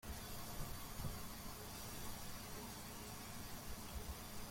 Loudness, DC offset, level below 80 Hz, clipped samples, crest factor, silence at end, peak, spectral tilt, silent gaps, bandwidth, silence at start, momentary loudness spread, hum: -50 LUFS; under 0.1%; -56 dBFS; under 0.1%; 16 dB; 0 s; -32 dBFS; -3.5 dB/octave; none; 16.5 kHz; 0.05 s; 2 LU; none